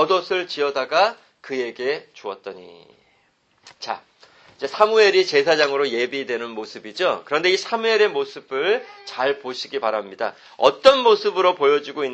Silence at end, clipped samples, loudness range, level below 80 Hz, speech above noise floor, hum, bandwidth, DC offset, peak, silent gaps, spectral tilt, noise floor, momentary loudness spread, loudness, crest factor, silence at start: 0 s; under 0.1%; 8 LU; -66 dBFS; 42 dB; none; 8.6 kHz; under 0.1%; 0 dBFS; none; -3 dB/octave; -63 dBFS; 17 LU; -20 LUFS; 20 dB; 0 s